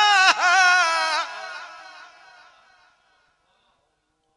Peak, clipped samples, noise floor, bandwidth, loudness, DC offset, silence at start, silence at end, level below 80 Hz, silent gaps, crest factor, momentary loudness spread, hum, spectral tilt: 0 dBFS; under 0.1%; -71 dBFS; 11.5 kHz; -17 LUFS; under 0.1%; 0 s; 2.55 s; -82 dBFS; none; 22 dB; 23 LU; none; 3 dB/octave